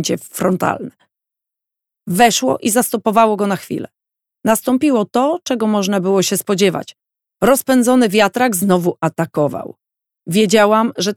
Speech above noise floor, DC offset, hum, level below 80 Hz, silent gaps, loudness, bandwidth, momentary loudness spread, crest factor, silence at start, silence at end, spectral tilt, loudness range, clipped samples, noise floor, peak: 69 dB; under 0.1%; none; -56 dBFS; none; -15 LUFS; 18 kHz; 10 LU; 16 dB; 0 s; 0 s; -4.5 dB/octave; 2 LU; under 0.1%; -84 dBFS; 0 dBFS